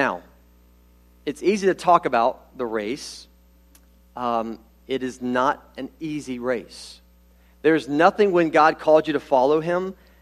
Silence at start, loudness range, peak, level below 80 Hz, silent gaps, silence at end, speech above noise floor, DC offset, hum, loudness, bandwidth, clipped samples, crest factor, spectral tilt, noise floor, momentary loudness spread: 0 s; 8 LU; -2 dBFS; -56 dBFS; none; 0.3 s; 33 dB; under 0.1%; 60 Hz at -55 dBFS; -22 LUFS; 13.5 kHz; under 0.1%; 20 dB; -5.5 dB/octave; -54 dBFS; 18 LU